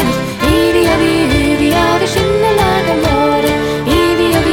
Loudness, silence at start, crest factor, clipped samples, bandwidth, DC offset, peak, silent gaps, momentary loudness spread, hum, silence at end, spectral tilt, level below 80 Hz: -12 LUFS; 0 s; 10 dB; under 0.1%; 17.5 kHz; under 0.1%; 0 dBFS; none; 3 LU; none; 0 s; -5 dB/octave; -26 dBFS